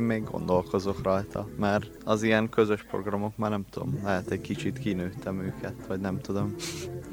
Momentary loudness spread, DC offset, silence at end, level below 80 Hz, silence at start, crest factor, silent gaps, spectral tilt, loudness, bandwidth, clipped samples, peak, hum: 9 LU; under 0.1%; 0 s; -54 dBFS; 0 s; 20 dB; none; -6.5 dB/octave; -30 LUFS; 17.5 kHz; under 0.1%; -8 dBFS; none